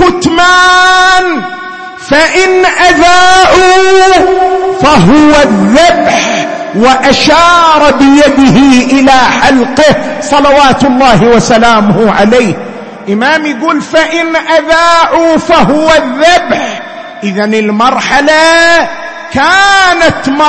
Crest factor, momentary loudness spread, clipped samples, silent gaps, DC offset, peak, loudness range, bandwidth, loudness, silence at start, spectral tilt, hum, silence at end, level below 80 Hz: 6 dB; 9 LU; 3%; none; under 0.1%; 0 dBFS; 3 LU; 11 kHz; -5 LUFS; 0 s; -4 dB/octave; none; 0 s; -30 dBFS